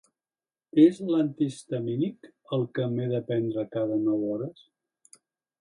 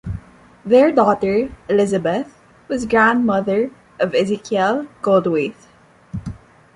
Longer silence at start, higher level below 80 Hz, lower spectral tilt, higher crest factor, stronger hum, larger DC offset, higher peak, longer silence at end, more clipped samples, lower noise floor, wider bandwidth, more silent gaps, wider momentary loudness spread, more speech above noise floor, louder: first, 0.75 s vs 0.05 s; second, -74 dBFS vs -46 dBFS; first, -8 dB/octave vs -6.5 dB/octave; about the same, 20 dB vs 16 dB; neither; neither; second, -8 dBFS vs -2 dBFS; first, 1.1 s vs 0.4 s; neither; first, under -90 dBFS vs -43 dBFS; about the same, 11 kHz vs 11 kHz; neither; second, 12 LU vs 17 LU; first, over 64 dB vs 27 dB; second, -27 LUFS vs -18 LUFS